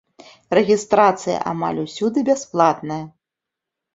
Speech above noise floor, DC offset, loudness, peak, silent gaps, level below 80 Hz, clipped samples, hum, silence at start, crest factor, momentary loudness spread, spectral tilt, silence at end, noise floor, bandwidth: 66 dB; under 0.1%; -19 LUFS; -2 dBFS; none; -60 dBFS; under 0.1%; none; 0.5 s; 18 dB; 11 LU; -5.5 dB/octave; 0.85 s; -85 dBFS; 8 kHz